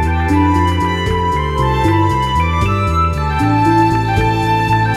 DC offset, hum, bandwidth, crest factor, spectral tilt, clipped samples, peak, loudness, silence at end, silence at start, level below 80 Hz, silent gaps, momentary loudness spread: under 0.1%; none; 14 kHz; 12 dB; -7 dB/octave; under 0.1%; -2 dBFS; -14 LUFS; 0 s; 0 s; -24 dBFS; none; 4 LU